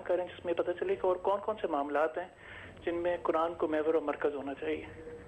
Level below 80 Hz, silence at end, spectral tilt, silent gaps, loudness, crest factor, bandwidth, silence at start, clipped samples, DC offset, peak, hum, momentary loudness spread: -62 dBFS; 0 s; -7 dB/octave; none; -33 LUFS; 16 dB; 8.6 kHz; 0 s; under 0.1%; under 0.1%; -18 dBFS; none; 10 LU